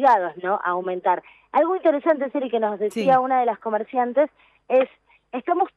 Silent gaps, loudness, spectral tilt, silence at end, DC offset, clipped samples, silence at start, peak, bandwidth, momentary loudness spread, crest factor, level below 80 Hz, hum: none; -22 LUFS; -6.5 dB/octave; 0.1 s; under 0.1%; under 0.1%; 0 s; -6 dBFS; 11.5 kHz; 7 LU; 16 dB; -74 dBFS; none